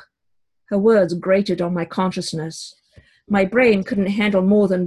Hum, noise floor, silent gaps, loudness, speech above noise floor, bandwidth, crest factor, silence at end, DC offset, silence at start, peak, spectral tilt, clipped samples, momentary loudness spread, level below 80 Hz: none; -73 dBFS; none; -18 LUFS; 56 dB; 11.5 kHz; 16 dB; 0 s; under 0.1%; 0.7 s; -4 dBFS; -6.5 dB/octave; under 0.1%; 11 LU; -54 dBFS